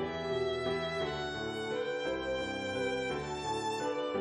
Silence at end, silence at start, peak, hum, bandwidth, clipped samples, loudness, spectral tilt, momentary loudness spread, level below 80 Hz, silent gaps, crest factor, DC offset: 0 s; 0 s; -22 dBFS; none; 11 kHz; under 0.1%; -35 LUFS; -4.5 dB/octave; 2 LU; -56 dBFS; none; 14 dB; under 0.1%